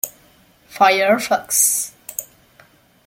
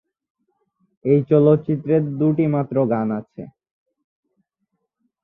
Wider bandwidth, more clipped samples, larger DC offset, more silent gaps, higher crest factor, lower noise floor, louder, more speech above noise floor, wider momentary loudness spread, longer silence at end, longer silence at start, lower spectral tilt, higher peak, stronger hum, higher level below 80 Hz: first, 17 kHz vs 3.8 kHz; neither; neither; neither; about the same, 20 dB vs 18 dB; second, -53 dBFS vs -75 dBFS; first, -16 LUFS vs -19 LUFS; second, 37 dB vs 57 dB; about the same, 15 LU vs 14 LU; second, 0.8 s vs 1.75 s; second, 0.05 s vs 1.05 s; second, -1 dB/octave vs -12.5 dB/octave; first, 0 dBFS vs -4 dBFS; neither; about the same, -64 dBFS vs -62 dBFS